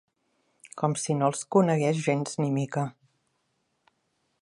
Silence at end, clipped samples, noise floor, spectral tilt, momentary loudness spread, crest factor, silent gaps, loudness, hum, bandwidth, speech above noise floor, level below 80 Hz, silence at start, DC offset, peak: 1.5 s; under 0.1%; -75 dBFS; -6 dB/octave; 8 LU; 20 dB; none; -27 LUFS; none; 11.5 kHz; 49 dB; -76 dBFS; 0.75 s; under 0.1%; -8 dBFS